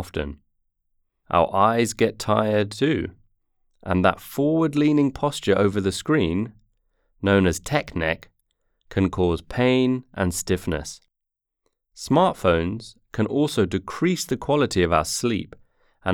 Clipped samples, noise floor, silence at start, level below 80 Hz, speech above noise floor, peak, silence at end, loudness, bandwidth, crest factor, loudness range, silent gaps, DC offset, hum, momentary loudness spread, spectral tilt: under 0.1%; -82 dBFS; 0 s; -48 dBFS; 60 dB; -4 dBFS; 0 s; -22 LUFS; 19.5 kHz; 20 dB; 3 LU; none; under 0.1%; none; 11 LU; -5.5 dB/octave